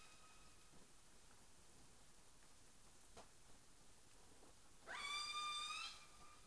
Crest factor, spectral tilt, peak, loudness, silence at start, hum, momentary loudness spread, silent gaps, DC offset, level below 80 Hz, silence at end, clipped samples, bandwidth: 20 dB; 0 dB/octave; -36 dBFS; -48 LUFS; 0 s; none; 22 LU; none; under 0.1%; -76 dBFS; 0 s; under 0.1%; 11 kHz